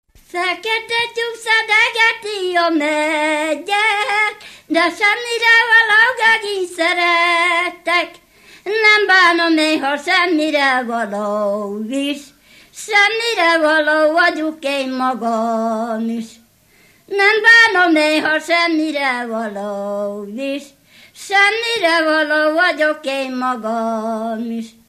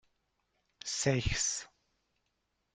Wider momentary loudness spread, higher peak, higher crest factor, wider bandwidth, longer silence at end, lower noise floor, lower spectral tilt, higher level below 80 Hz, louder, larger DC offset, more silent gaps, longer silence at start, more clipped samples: first, 13 LU vs 10 LU; first, 0 dBFS vs -14 dBFS; second, 16 dB vs 24 dB; first, 15 kHz vs 10 kHz; second, 0.2 s vs 1.1 s; second, -52 dBFS vs -81 dBFS; about the same, -2.5 dB/octave vs -3 dB/octave; second, -64 dBFS vs -50 dBFS; first, -15 LUFS vs -33 LUFS; neither; neither; second, 0.35 s vs 0.85 s; neither